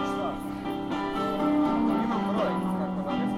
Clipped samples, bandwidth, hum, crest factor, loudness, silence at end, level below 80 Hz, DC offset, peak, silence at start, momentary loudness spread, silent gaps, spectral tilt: under 0.1%; 13.5 kHz; none; 12 dB; -28 LUFS; 0 s; -52 dBFS; under 0.1%; -14 dBFS; 0 s; 8 LU; none; -7 dB/octave